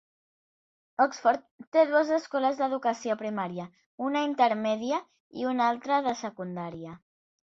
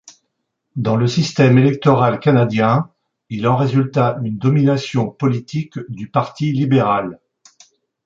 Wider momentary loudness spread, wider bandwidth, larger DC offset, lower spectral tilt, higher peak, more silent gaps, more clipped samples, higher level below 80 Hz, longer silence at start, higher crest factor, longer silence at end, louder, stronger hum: about the same, 14 LU vs 12 LU; about the same, 7.8 kHz vs 7.6 kHz; neither; second, -5 dB/octave vs -7.5 dB/octave; second, -10 dBFS vs -2 dBFS; first, 1.51-1.59 s, 1.67-1.72 s, 3.86-3.98 s, 5.20-5.30 s vs none; neither; second, -74 dBFS vs -54 dBFS; first, 1 s vs 0.75 s; first, 20 dB vs 14 dB; second, 0.5 s vs 0.9 s; second, -28 LUFS vs -16 LUFS; neither